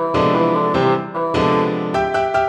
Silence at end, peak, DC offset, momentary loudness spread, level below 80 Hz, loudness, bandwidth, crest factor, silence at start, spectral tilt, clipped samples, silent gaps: 0 s; -4 dBFS; under 0.1%; 4 LU; -46 dBFS; -17 LUFS; 10 kHz; 12 dB; 0 s; -7 dB/octave; under 0.1%; none